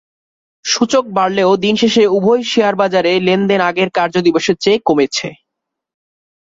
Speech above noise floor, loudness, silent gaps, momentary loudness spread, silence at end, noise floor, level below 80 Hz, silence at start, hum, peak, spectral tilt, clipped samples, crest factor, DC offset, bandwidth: 66 dB; -13 LUFS; none; 4 LU; 1.25 s; -79 dBFS; -56 dBFS; 0.65 s; none; 0 dBFS; -4.5 dB/octave; under 0.1%; 14 dB; under 0.1%; 8 kHz